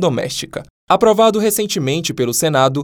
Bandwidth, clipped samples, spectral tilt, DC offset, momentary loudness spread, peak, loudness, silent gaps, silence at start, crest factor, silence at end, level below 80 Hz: over 20 kHz; under 0.1%; -4 dB/octave; under 0.1%; 11 LU; 0 dBFS; -15 LUFS; 0.70-0.87 s; 0 s; 14 dB; 0 s; -52 dBFS